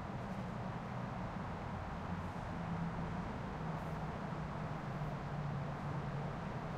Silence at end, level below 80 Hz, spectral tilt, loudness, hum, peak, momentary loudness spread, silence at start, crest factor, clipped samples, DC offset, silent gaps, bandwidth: 0 s; -54 dBFS; -7.5 dB/octave; -43 LUFS; none; -30 dBFS; 2 LU; 0 s; 12 dB; under 0.1%; under 0.1%; none; 11 kHz